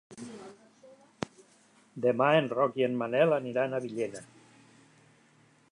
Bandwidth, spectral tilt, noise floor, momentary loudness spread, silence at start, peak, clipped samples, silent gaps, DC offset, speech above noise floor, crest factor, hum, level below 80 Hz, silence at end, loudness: 11 kHz; -6 dB/octave; -63 dBFS; 22 LU; 0.1 s; -10 dBFS; under 0.1%; none; under 0.1%; 35 dB; 20 dB; none; -78 dBFS; 1.45 s; -29 LUFS